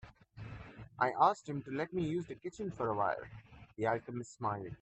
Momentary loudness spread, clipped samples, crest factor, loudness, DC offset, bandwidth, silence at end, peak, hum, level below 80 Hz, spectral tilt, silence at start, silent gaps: 21 LU; under 0.1%; 22 dB; -36 LUFS; under 0.1%; 8.4 kHz; 0.05 s; -14 dBFS; none; -64 dBFS; -6.5 dB/octave; 0.05 s; none